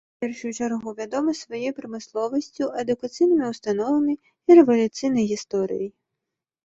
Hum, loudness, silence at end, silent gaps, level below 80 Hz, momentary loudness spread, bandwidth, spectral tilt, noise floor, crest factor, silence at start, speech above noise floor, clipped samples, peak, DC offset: none; -23 LUFS; 0.75 s; none; -66 dBFS; 14 LU; 8 kHz; -5.5 dB/octave; -84 dBFS; 20 dB; 0.2 s; 62 dB; under 0.1%; -4 dBFS; under 0.1%